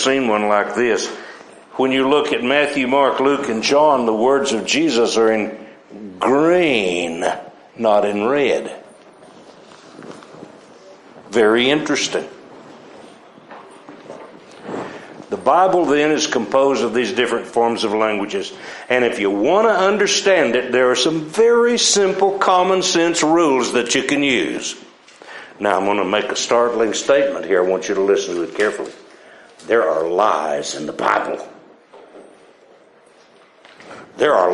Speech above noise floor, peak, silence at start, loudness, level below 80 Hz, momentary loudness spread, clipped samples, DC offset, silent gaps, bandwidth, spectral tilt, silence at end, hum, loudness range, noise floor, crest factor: 33 dB; -2 dBFS; 0 s; -17 LUFS; -64 dBFS; 17 LU; under 0.1%; under 0.1%; none; 11.5 kHz; -3 dB/octave; 0 s; none; 8 LU; -49 dBFS; 16 dB